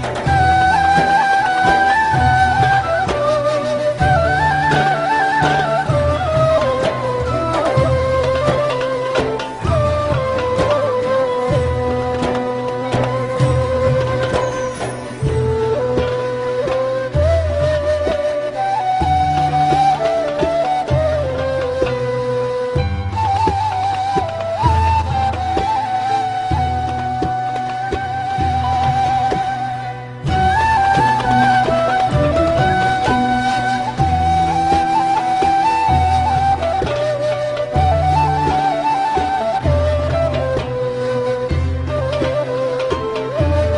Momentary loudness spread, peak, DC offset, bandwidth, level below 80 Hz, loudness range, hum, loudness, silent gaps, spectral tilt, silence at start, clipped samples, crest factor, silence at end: 6 LU; -2 dBFS; under 0.1%; 10.5 kHz; -30 dBFS; 4 LU; none; -17 LUFS; none; -6 dB/octave; 0 s; under 0.1%; 14 dB; 0 s